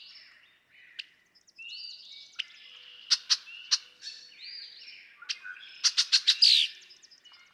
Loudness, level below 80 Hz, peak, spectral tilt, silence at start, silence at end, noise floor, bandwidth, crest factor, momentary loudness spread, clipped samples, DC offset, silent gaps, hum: -25 LUFS; under -90 dBFS; -10 dBFS; 6 dB/octave; 1 s; 0.8 s; -63 dBFS; 16 kHz; 22 dB; 27 LU; under 0.1%; under 0.1%; none; none